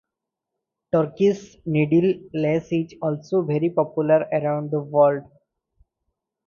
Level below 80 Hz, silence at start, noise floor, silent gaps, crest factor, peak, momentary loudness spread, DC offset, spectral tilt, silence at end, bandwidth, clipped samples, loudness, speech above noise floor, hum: -62 dBFS; 0.95 s; -84 dBFS; none; 18 dB; -4 dBFS; 7 LU; under 0.1%; -8.5 dB/octave; 1.25 s; 7.2 kHz; under 0.1%; -22 LUFS; 63 dB; none